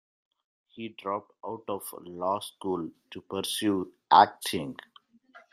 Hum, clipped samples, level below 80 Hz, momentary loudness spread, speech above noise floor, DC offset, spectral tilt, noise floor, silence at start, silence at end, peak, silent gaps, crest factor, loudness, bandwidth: none; under 0.1%; -74 dBFS; 20 LU; 29 dB; under 0.1%; -4 dB/octave; -57 dBFS; 0.75 s; 0.15 s; -4 dBFS; none; 26 dB; -28 LUFS; 15.5 kHz